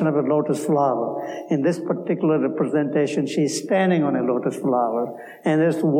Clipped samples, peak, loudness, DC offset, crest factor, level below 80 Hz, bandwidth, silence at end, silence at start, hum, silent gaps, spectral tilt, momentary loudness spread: under 0.1%; -8 dBFS; -22 LUFS; under 0.1%; 14 dB; -76 dBFS; 15.5 kHz; 0 s; 0 s; none; none; -6.5 dB/octave; 6 LU